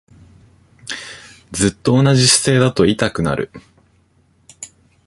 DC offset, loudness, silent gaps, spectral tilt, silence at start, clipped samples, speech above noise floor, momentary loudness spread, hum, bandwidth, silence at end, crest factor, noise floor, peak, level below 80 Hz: under 0.1%; -14 LUFS; none; -4.5 dB/octave; 0.85 s; under 0.1%; 42 dB; 24 LU; none; 11.5 kHz; 0.4 s; 18 dB; -57 dBFS; 0 dBFS; -44 dBFS